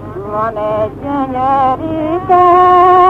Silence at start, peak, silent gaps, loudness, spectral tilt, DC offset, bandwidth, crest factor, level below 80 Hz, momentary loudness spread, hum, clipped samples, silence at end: 0 s; 0 dBFS; none; -12 LUFS; -8 dB/octave; under 0.1%; 6 kHz; 10 dB; -38 dBFS; 11 LU; 50 Hz at -35 dBFS; under 0.1%; 0 s